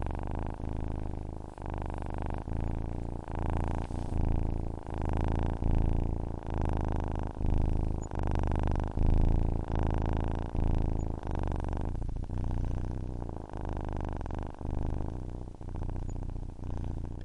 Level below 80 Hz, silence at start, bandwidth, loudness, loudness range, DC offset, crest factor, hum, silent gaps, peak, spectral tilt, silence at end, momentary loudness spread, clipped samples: -34 dBFS; 0 s; 7.4 kHz; -35 LUFS; 6 LU; 0.1%; 18 dB; none; none; -14 dBFS; -8.5 dB/octave; 0 s; 8 LU; under 0.1%